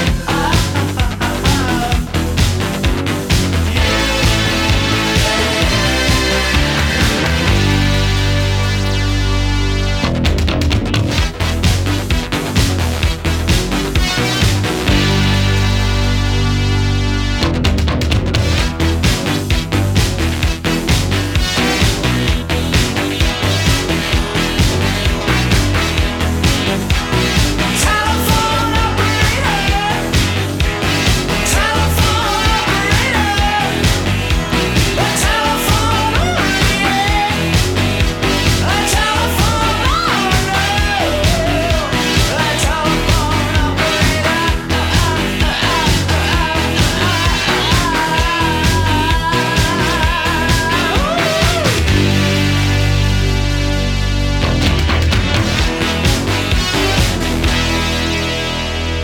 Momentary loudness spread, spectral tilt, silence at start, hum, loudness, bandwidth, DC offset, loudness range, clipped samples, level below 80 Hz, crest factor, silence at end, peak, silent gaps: 3 LU; -4.5 dB/octave; 0 s; none; -14 LUFS; 19 kHz; under 0.1%; 2 LU; under 0.1%; -20 dBFS; 14 dB; 0 s; 0 dBFS; none